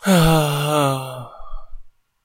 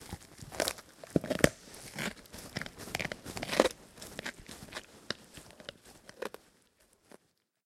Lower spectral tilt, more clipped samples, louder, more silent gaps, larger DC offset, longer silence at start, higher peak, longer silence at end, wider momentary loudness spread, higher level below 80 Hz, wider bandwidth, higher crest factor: first, -5.5 dB/octave vs -4 dB/octave; neither; first, -18 LUFS vs -36 LUFS; neither; neither; about the same, 0 s vs 0 s; about the same, -2 dBFS vs -4 dBFS; second, 0.35 s vs 1.35 s; about the same, 20 LU vs 19 LU; first, -36 dBFS vs -58 dBFS; about the same, 16 kHz vs 16.5 kHz; second, 18 dB vs 34 dB